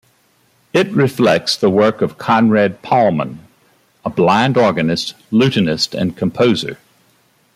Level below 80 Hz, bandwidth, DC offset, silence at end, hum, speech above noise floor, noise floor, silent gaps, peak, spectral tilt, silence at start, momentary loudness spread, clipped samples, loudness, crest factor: -54 dBFS; 15 kHz; under 0.1%; 0.8 s; none; 42 dB; -57 dBFS; none; -2 dBFS; -5.5 dB/octave; 0.75 s; 8 LU; under 0.1%; -15 LUFS; 14 dB